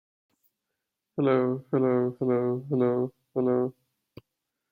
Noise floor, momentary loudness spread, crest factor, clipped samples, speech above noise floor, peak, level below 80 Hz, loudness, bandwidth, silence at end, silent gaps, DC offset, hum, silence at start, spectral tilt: -84 dBFS; 6 LU; 16 dB; under 0.1%; 59 dB; -12 dBFS; -72 dBFS; -27 LUFS; 4.2 kHz; 1 s; none; under 0.1%; none; 1.15 s; -10.5 dB/octave